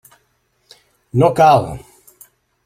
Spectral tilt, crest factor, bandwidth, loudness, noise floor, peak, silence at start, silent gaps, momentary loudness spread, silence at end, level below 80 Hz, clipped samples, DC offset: -7 dB/octave; 16 dB; 16 kHz; -14 LUFS; -63 dBFS; -2 dBFS; 1.15 s; none; 19 LU; 0.85 s; -48 dBFS; under 0.1%; under 0.1%